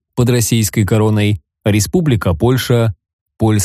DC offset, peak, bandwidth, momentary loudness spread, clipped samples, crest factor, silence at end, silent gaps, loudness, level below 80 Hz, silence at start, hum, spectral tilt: under 0.1%; -2 dBFS; 15.5 kHz; 5 LU; under 0.1%; 12 dB; 0 s; 3.13-3.26 s; -14 LUFS; -36 dBFS; 0.15 s; none; -5.5 dB/octave